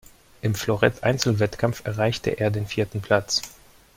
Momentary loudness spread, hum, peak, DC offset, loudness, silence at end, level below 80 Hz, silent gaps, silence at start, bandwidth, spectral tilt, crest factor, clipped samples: 6 LU; none; -2 dBFS; under 0.1%; -24 LUFS; 0.45 s; -50 dBFS; none; 0.45 s; 16.5 kHz; -5 dB/octave; 22 dB; under 0.1%